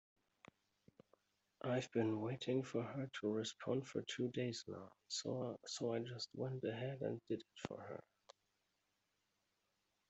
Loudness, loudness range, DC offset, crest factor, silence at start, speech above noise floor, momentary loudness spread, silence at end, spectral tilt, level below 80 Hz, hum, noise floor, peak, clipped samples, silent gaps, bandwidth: -44 LUFS; 6 LU; under 0.1%; 20 dB; 1.65 s; 42 dB; 9 LU; 2.1 s; -5.5 dB/octave; -84 dBFS; none; -86 dBFS; -24 dBFS; under 0.1%; none; 8.2 kHz